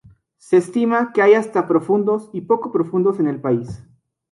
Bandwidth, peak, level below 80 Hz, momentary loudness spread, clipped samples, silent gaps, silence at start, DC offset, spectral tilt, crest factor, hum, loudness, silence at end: 11.5 kHz; -2 dBFS; -58 dBFS; 8 LU; under 0.1%; none; 0.5 s; under 0.1%; -7.5 dB/octave; 16 dB; none; -18 LUFS; 0.5 s